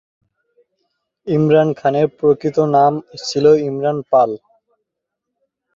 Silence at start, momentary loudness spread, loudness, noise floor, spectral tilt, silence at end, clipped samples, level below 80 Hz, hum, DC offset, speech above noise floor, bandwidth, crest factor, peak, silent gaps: 1.25 s; 9 LU; -16 LUFS; -79 dBFS; -7 dB/octave; 1.4 s; under 0.1%; -60 dBFS; none; under 0.1%; 64 dB; 7.6 kHz; 16 dB; -2 dBFS; none